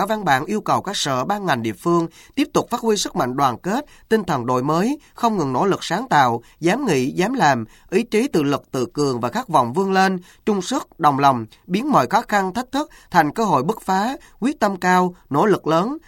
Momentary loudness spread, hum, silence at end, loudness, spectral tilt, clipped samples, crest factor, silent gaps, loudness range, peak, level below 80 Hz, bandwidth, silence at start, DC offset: 7 LU; none; 0.1 s; -20 LUFS; -5 dB/octave; under 0.1%; 18 dB; none; 2 LU; 0 dBFS; -52 dBFS; 17 kHz; 0 s; under 0.1%